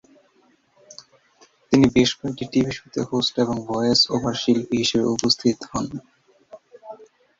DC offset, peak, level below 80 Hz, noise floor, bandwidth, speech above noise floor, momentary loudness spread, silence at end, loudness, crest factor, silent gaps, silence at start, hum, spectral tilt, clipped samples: under 0.1%; -2 dBFS; -52 dBFS; -61 dBFS; 7.8 kHz; 40 dB; 12 LU; 0.35 s; -21 LUFS; 20 dB; none; 1.7 s; none; -4.5 dB/octave; under 0.1%